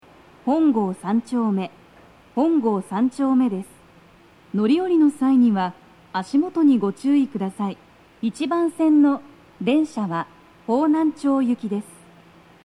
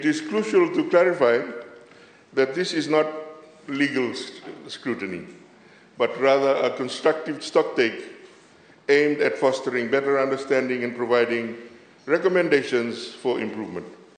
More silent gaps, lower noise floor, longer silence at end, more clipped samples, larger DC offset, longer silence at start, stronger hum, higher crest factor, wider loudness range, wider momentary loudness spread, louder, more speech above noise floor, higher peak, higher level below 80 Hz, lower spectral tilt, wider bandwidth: neither; about the same, -51 dBFS vs -52 dBFS; first, 0.8 s vs 0.25 s; neither; neither; first, 0.45 s vs 0 s; neither; about the same, 14 dB vs 18 dB; about the same, 3 LU vs 4 LU; second, 12 LU vs 17 LU; about the same, -21 LUFS vs -23 LUFS; about the same, 31 dB vs 30 dB; second, -8 dBFS vs -4 dBFS; first, -64 dBFS vs -76 dBFS; first, -7 dB/octave vs -5 dB/octave; first, 11 kHz vs 9.6 kHz